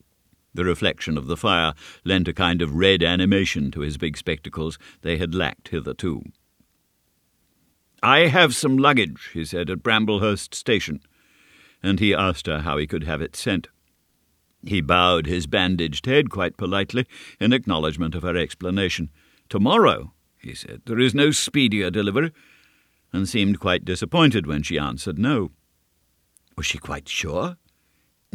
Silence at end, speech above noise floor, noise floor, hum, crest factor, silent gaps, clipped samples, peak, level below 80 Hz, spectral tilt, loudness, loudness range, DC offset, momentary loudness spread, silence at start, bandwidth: 0.8 s; 46 dB; -68 dBFS; none; 22 dB; none; under 0.1%; 0 dBFS; -44 dBFS; -4.5 dB/octave; -22 LUFS; 7 LU; under 0.1%; 12 LU; 0.55 s; 15 kHz